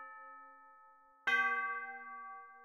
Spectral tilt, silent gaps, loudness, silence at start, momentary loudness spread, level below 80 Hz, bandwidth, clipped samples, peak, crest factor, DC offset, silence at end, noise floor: -1 dB/octave; none; -36 LUFS; 0 s; 22 LU; -86 dBFS; 15 kHz; under 0.1%; -20 dBFS; 20 dB; under 0.1%; 0 s; -64 dBFS